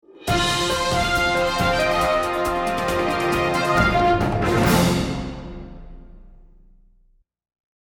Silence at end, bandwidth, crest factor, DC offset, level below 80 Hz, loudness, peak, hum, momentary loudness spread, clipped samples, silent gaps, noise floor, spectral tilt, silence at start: 1.6 s; over 20 kHz; 16 dB; under 0.1%; -36 dBFS; -20 LUFS; -6 dBFS; none; 11 LU; under 0.1%; none; -59 dBFS; -4.5 dB/octave; 0.2 s